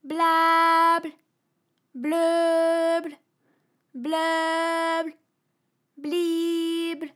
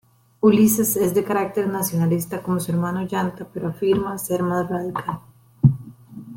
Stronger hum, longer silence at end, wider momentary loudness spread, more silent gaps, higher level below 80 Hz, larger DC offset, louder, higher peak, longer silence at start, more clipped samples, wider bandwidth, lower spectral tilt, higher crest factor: neither; about the same, 0.05 s vs 0 s; first, 17 LU vs 12 LU; neither; second, under -90 dBFS vs -54 dBFS; neither; about the same, -23 LUFS vs -21 LUFS; second, -10 dBFS vs -2 dBFS; second, 0.05 s vs 0.45 s; neither; about the same, 15.5 kHz vs 17 kHz; second, -2 dB/octave vs -6.5 dB/octave; second, 14 dB vs 20 dB